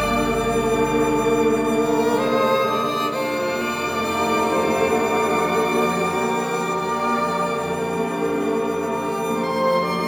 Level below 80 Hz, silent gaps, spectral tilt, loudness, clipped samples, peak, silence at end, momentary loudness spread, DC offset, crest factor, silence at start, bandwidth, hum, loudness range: -46 dBFS; none; -5 dB/octave; -21 LUFS; under 0.1%; -8 dBFS; 0 s; 4 LU; under 0.1%; 14 dB; 0 s; over 20 kHz; none; 3 LU